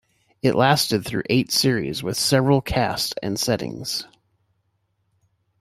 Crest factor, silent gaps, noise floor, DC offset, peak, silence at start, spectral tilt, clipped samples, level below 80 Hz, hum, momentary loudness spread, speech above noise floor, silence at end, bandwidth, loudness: 20 dB; none; -70 dBFS; under 0.1%; -4 dBFS; 0.45 s; -4.5 dB/octave; under 0.1%; -48 dBFS; none; 8 LU; 49 dB; 1.55 s; 16 kHz; -21 LUFS